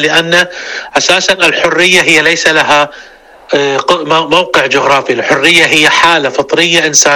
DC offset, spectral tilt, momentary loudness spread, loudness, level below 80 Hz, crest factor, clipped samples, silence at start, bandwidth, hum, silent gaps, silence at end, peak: under 0.1%; -1.5 dB/octave; 7 LU; -7 LUFS; -46 dBFS; 10 dB; 0.9%; 0 s; over 20 kHz; none; none; 0 s; 0 dBFS